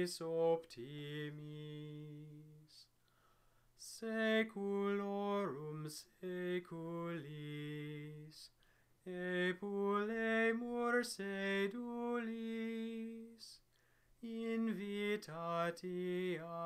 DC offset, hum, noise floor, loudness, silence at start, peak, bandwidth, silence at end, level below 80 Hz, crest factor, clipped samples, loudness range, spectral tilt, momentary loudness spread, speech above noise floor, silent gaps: under 0.1%; none; -74 dBFS; -41 LUFS; 0 s; -24 dBFS; 15.5 kHz; 0 s; -80 dBFS; 18 dB; under 0.1%; 8 LU; -5.5 dB/octave; 17 LU; 33 dB; none